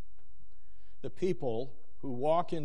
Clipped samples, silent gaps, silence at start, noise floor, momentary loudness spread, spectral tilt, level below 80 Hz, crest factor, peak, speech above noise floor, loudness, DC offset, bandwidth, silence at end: under 0.1%; none; 1.05 s; -62 dBFS; 16 LU; -7.5 dB/octave; -62 dBFS; 18 dB; -16 dBFS; 29 dB; -34 LUFS; 3%; 11.5 kHz; 0 s